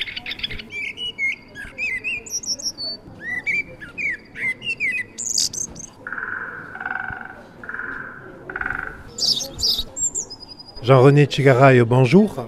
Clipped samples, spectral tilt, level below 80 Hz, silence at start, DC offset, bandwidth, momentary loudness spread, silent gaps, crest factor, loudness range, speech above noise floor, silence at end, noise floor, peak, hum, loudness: under 0.1%; -4 dB/octave; -48 dBFS; 0 s; under 0.1%; 15 kHz; 19 LU; none; 20 dB; 10 LU; 26 dB; 0 s; -39 dBFS; 0 dBFS; none; -20 LUFS